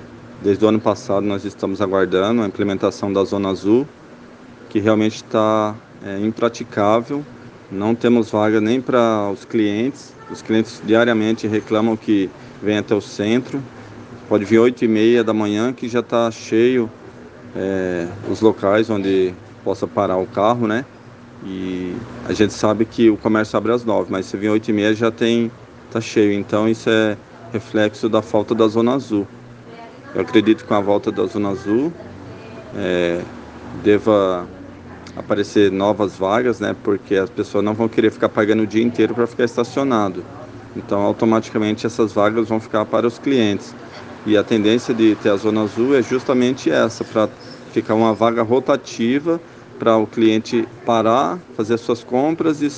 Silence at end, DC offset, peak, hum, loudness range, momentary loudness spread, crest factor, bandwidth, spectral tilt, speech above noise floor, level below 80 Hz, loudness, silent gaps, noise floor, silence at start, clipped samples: 0 s; under 0.1%; 0 dBFS; none; 3 LU; 13 LU; 18 dB; 8.8 kHz; -6 dB/octave; 23 dB; -56 dBFS; -18 LUFS; none; -41 dBFS; 0 s; under 0.1%